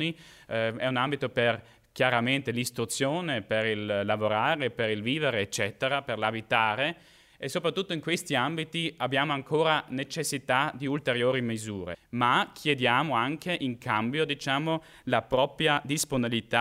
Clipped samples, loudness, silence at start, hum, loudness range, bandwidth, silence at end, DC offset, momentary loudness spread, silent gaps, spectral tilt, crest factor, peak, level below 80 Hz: under 0.1%; -28 LUFS; 0 s; none; 1 LU; 16 kHz; 0 s; under 0.1%; 7 LU; none; -4 dB/octave; 20 dB; -8 dBFS; -64 dBFS